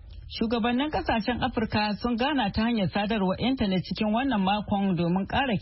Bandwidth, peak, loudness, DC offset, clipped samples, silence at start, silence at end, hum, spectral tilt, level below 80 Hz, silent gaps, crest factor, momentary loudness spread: 5.8 kHz; -14 dBFS; -26 LUFS; under 0.1%; under 0.1%; 0 s; 0 s; none; -10 dB/octave; -44 dBFS; none; 12 dB; 2 LU